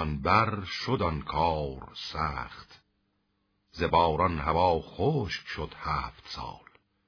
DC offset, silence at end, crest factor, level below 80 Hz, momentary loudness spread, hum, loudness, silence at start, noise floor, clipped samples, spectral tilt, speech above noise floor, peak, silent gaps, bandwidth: under 0.1%; 0.5 s; 22 dB; -46 dBFS; 14 LU; none; -29 LUFS; 0 s; -75 dBFS; under 0.1%; -6.5 dB/octave; 46 dB; -8 dBFS; none; 5.4 kHz